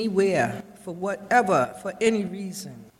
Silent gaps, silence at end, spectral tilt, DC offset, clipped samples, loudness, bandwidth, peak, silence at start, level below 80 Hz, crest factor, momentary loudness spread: none; 0.15 s; -5 dB/octave; under 0.1%; under 0.1%; -24 LUFS; 16 kHz; -6 dBFS; 0 s; -64 dBFS; 18 dB; 15 LU